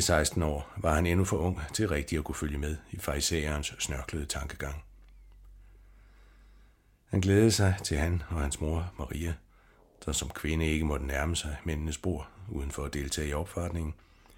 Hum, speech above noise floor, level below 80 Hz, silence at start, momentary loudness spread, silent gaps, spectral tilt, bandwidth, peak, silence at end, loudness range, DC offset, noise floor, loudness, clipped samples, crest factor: none; 31 dB; -40 dBFS; 0 s; 11 LU; none; -4.5 dB/octave; 17 kHz; -10 dBFS; 0.4 s; 6 LU; under 0.1%; -62 dBFS; -31 LUFS; under 0.1%; 22 dB